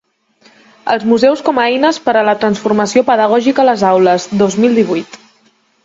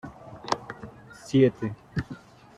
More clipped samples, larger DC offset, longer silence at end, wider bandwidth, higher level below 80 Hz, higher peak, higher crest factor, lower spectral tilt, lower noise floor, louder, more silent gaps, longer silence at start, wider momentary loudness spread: neither; neither; first, 0.7 s vs 0.4 s; second, 8 kHz vs 11.5 kHz; about the same, -56 dBFS vs -56 dBFS; first, 0 dBFS vs -6 dBFS; second, 12 dB vs 22 dB; second, -5 dB/octave vs -7 dB/octave; first, -54 dBFS vs -45 dBFS; first, -12 LUFS vs -27 LUFS; neither; first, 0.85 s vs 0.05 s; second, 6 LU vs 23 LU